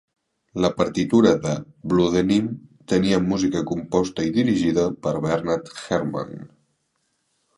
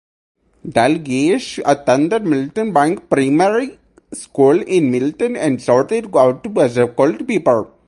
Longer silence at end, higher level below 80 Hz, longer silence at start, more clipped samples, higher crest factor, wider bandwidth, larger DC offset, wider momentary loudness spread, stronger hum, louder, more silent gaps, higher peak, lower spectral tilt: first, 1.1 s vs 0.2 s; first, -50 dBFS vs -56 dBFS; about the same, 0.55 s vs 0.65 s; neither; about the same, 20 dB vs 16 dB; about the same, 11.5 kHz vs 11.5 kHz; neither; first, 11 LU vs 5 LU; neither; second, -22 LUFS vs -16 LUFS; neither; about the same, -2 dBFS vs 0 dBFS; about the same, -6 dB/octave vs -6 dB/octave